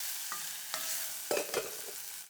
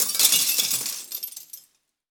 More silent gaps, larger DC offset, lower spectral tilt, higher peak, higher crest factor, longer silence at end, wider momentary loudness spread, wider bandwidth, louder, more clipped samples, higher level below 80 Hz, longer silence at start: neither; neither; first, 0 dB/octave vs 2 dB/octave; second, -14 dBFS vs -4 dBFS; about the same, 24 dB vs 22 dB; second, 0 s vs 0.5 s; second, 6 LU vs 21 LU; about the same, over 20 kHz vs over 20 kHz; second, -35 LUFS vs -20 LUFS; neither; second, -82 dBFS vs -74 dBFS; about the same, 0 s vs 0 s